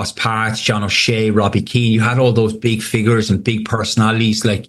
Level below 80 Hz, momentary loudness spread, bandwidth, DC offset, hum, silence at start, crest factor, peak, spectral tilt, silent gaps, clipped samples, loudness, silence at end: -46 dBFS; 4 LU; 12.5 kHz; under 0.1%; none; 0 s; 14 dB; -2 dBFS; -5 dB/octave; none; under 0.1%; -15 LUFS; 0.05 s